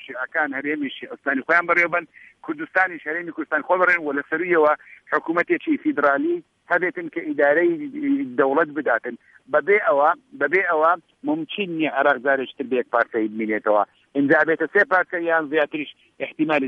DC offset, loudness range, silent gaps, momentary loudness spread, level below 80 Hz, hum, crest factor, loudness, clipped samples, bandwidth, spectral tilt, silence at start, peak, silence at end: under 0.1%; 2 LU; none; 10 LU; -72 dBFS; none; 18 dB; -21 LUFS; under 0.1%; 6.8 kHz; -7 dB/octave; 0 s; -4 dBFS; 0 s